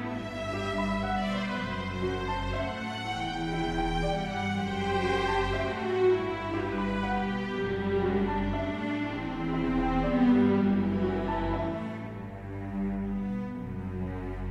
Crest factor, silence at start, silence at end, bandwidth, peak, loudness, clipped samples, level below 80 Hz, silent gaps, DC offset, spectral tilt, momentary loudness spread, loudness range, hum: 16 dB; 0 s; 0 s; 11 kHz; -14 dBFS; -30 LUFS; under 0.1%; -42 dBFS; none; under 0.1%; -7 dB/octave; 10 LU; 4 LU; none